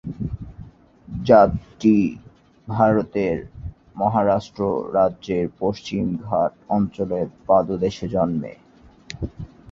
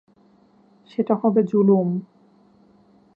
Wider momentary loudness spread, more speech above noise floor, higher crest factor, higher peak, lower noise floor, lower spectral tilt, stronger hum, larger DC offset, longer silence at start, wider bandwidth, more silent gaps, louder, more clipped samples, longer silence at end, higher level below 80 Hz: first, 18 LU vs 12 LU; second, 24 dB vs 37 dB; about the same, 20 dB vs 18 dB; first, -2 dBFS vs -6 dBFS; second, -44 dBFS vs -56 dBFS; second, -8 dB/octave vs -11.5 dB/octave; neither; neither; second, 0.05 s vs 1 s; first, 7.4 kHz vs 4.9 kHz; neither; about the same, -21 LUFS vs -20 LUFS; neither; second, 0.25 s vs 1.1 s; first, -44 dBFS vs -74 dBFS